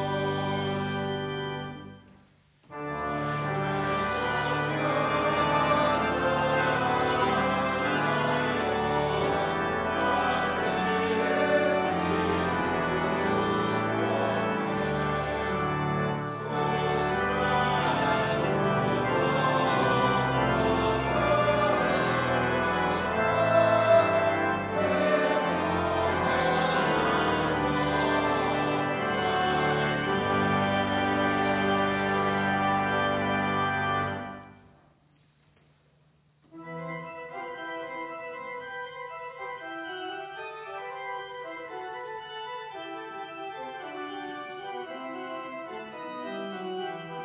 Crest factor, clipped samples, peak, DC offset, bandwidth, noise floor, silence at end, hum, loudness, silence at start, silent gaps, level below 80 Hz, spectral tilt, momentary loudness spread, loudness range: 18 dB; under 0.1%; -10 dBFS; under 0.1%; 4 kHz; -64 dBFS; 0 s; none; -27 LUFS; 0 s; none; -50 dBFS; -4 dB/octave; 14 LU; 13 LU